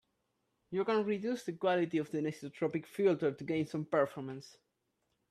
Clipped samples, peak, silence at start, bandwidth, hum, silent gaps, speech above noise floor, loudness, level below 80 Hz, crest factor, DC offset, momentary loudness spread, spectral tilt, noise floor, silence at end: under 0.1%; -18 dBFS; 0.7 s; 13.5 kHz; none; none; 47 dB; -35 LUFS; -78 dBFS; 18 dB; under 0.1%; 8 LU; -6.5 dB/octave; -82 dBFS; 0.8 s